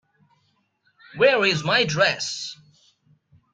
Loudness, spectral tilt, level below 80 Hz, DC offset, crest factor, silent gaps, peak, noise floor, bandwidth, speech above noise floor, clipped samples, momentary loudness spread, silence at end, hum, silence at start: -20 LUFS; -3.5 dB/octave; -64 dBFS; under 0.1%; 20 dB; none; -4 dBFS; -68 dBFS; 9.4 kHz; 47 dB; under 0.1%; 15 LU; 1 s; none; 1.15 s